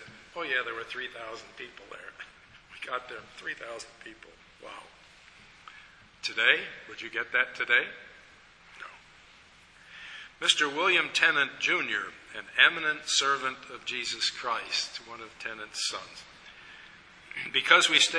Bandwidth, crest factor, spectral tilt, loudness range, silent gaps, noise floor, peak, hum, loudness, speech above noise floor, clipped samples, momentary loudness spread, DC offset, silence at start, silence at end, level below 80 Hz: 11 kHz; 28 dB; 0 dB/octave; 16 LU; none; -56 dBFS; -4 dBFS; none; -27 LUFS; 27 dB; under 0.1%; 24 LU; under 0.1%; 0 s; 0 s; -70 dBFS